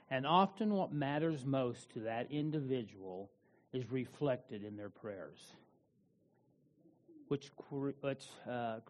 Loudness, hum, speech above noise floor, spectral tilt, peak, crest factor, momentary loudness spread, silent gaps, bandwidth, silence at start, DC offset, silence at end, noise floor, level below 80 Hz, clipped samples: -39 LUFS; none; 36 dB; -7 dB/octave; -18 dBFS; 22 dB; 15 LU; none; 10 kHz; 0.1 s; under 0.1%; 0.1 s; -74 dBFS; -80 dBFS; under 0.1%